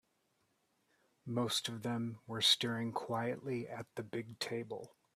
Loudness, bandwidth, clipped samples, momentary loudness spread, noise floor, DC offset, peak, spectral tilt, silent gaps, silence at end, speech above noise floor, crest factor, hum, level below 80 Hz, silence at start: -37 LUFS; 15.5 kHz; under 0.1%; 15 LU; -79 dBFS; under 0.1%; -16 dBFS; -3.5 dB/octave; none; 0.25 s; 41 dB; 24 dB; none; -78 dBFS; 1.25 s